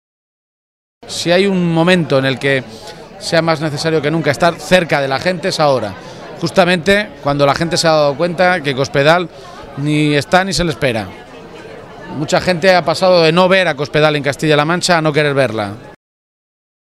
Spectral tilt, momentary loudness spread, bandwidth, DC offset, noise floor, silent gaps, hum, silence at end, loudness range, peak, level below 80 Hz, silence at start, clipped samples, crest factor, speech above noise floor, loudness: -5 dB/octave; 18 LU; 15 kHz; under 0.1%; -33 dBFS; none; none; 1 s; 3 LU; 0 dBFS; -42 dBFS; 1.05 s; under 0.1%; 14 dB; 20 dB; -13 LUFS